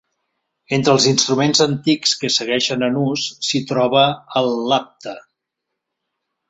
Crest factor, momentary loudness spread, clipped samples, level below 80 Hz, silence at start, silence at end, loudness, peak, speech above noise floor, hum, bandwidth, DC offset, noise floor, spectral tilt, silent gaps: 18 dB; 7 LU; under 0.1%; -60 dBFS; 0.7 s; 1.3 s; -17 LUFS; -2 dBFS; 62 dB; none; 8.4 kHz; under 0.1%; -79 dBFS; -3.5 dB/octave; none